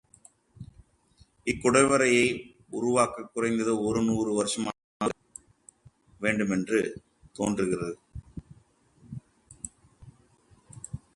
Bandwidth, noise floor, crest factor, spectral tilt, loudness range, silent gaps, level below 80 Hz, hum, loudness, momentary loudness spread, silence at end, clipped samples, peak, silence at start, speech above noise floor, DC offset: 11.5 kHz; -62 dBFS; 22 dB; -4.5 dB/octave; 10 LU; 4.84-5.00 s; -56 dBFS; none; -27 LUFS; 25 LU; 0.2 s; under 0.1%; -8 dBFS; 0.6 s; 36 dB; under 0.1%